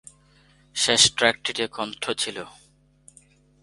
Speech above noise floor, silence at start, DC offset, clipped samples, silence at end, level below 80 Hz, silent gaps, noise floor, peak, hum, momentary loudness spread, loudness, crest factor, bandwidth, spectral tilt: 34 dB; 0.75 s; under 0.1%; under 0.1%; 1.15 s; -60 dBFS; none; -58 dBFS; -2 dBFS; none; 17 LU; -22 LUFS; 26 dB; 11.5 kHz; -1 dB/octave